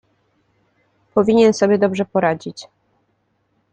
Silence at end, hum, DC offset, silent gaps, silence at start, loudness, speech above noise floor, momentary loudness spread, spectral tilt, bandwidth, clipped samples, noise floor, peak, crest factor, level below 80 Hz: 1.1 s; none; under 0.1%; none; 1.15 s; -17 LUFS; 50 dB; 15 LU; -6 dB/octave; 9 kHz; under 0.1%; -66 dBFS; -2 dBFS; 18 dB; -60 dBFS